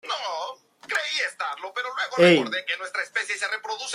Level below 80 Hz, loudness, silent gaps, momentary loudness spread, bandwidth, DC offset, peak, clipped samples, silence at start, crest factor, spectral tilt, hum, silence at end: -74 dBFS; -24 LUFS; none; 14 LU; 13.5 kHz; under 0.1%; -4 dBFS; under 0.1%; 0.05 s; 20 dB; -3.5 dB/octave; none; 0 s